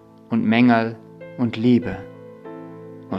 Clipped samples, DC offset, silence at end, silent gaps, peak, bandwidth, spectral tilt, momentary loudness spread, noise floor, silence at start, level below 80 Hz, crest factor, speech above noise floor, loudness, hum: under 0.1%; under 0.1%; 0 s; none; -2 dBFS; 5.8 kHz; -8.5 dB/octave; 23 LU; -38 dBFS; 0.3 s; -56 dBFS; 18 dB; 20 dB; -20 LUFS; none